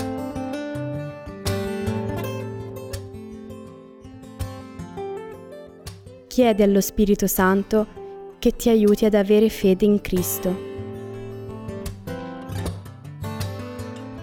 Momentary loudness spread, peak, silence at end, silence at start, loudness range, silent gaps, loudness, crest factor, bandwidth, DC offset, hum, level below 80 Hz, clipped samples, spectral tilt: 22 LU; -6 dBFS; 0 s; 0 s; 15 LU; none; -23 LUFS; 18 dB; over 20 kHz; under 0.1%; none; -42 dBFS; under 0.1%; -6 dB/octave